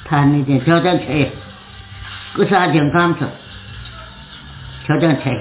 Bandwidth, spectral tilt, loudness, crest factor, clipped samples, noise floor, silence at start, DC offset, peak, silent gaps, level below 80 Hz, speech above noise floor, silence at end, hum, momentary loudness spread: 4 kHz; -11 dB/octave; -16 LUFS; 16 dB; under 0.1%; -36 dBFS; 0 s; under 0.1%; -2 dBFS; none; -42 dBFS; 22 dB; 0 s; none; 21 LU